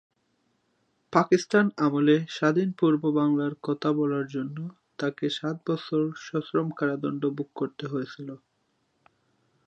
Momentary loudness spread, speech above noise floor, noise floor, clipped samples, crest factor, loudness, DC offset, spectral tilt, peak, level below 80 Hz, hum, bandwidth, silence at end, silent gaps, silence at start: 10 LU; 47 dB; -73 dBFS; under 0.1%; 24 dB; -27 LUFS; under 0.1%; -6.5 dB/octave; -4 dBFS; -76 dBFS; none; 8.4 kHz; 1.3 s; none; 1.1 s